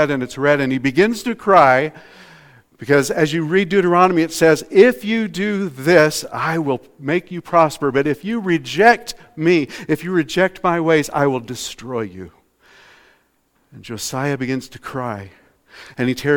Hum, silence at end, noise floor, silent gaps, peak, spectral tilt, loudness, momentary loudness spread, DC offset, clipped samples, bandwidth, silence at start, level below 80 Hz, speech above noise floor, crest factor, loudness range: none; 0 s; -62 dBFS; none; 0 dBFS; -5.5 dB/octave; -17 LUFS; 13 LU; under 0.1%; under 0.1%; 18.5 kHz; 0 s; -54 dBFS; 45 dB; 18 dB; 12 LU